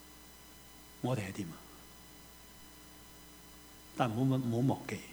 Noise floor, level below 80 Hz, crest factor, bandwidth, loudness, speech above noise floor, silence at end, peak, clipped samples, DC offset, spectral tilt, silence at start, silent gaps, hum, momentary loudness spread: -55 dBFS; -64 dBFS; 22 dB; over 20 kHz; -35 LUFS; 21 dB; 0 s; -16 dBFS; under 0.1%; under 0.1%; -6.5 dB/octave; 0 s; none; none; 21 LU